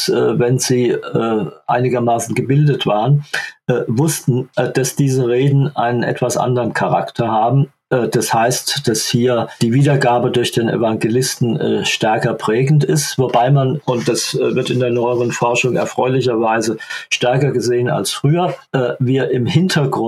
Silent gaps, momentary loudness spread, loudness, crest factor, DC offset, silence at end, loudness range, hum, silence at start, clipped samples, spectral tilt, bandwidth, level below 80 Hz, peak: none; 4 LU; -16 LUFS; 14 dB; under 0.1%; 0 s; 1 LU; none; 0 s; under 0.1%; -5.5 dB/octave; 14 kHz; -60 dBFS; 0 dBFS